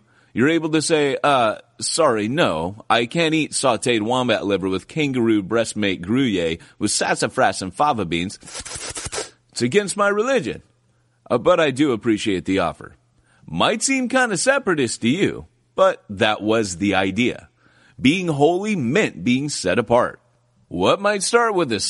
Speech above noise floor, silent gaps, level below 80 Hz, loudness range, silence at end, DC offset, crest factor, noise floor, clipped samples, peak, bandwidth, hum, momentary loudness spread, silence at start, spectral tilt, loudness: 42 dB; none; -54 dBFS; 3 LU; 0 s; under 0.1%; 18 dB; -62 dBFS; under 0.1%; -2 dBFS; 11.5 kHz; none; 9 LU; 0.35 s; -4 dB/octave; -20 LUFS